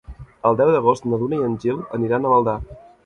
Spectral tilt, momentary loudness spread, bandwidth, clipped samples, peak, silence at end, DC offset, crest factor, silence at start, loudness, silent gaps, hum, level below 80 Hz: -8.5 dB/octave; 8 LU; 9.4 kHz; under 0.1%; -4 dBFS; 0.25 s; under 0.1%; 16 dB; 0.1 s; -20 LUFS; none; none; -44 dBFS